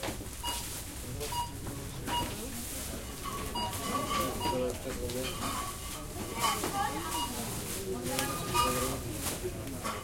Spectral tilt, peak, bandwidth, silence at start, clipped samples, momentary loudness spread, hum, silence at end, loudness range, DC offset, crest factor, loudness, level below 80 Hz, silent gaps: -3.5 dB/octave; -10 dBFS; 16.5 kHz; 0 s; under 0.1%; 8 LU; none; 0 s; 4 LU; under 0.1%; 24 dB; -34 LUFS; -46 dBFS; none